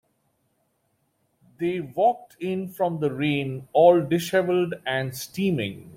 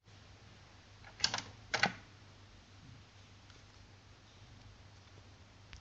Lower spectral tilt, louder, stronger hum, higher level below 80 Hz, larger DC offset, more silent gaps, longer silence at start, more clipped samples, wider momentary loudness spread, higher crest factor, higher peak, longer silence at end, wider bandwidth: first, -6 dB/octave vs -2 dB/octave; first, -24 LUFS vs -36 LUFS; neither; about the same, -64 dBFS vs -66 dBFS; neither; neither; first, 1.6 s vs 0.05 s; neither; second, 12 LU vs 24 LU; second, 20 dB vs 34 dB; first, -6 dBFS vs -12 dBFS; about the same, 0 s vs 0 s; first, 16.5 kHz vs 8.4 kHz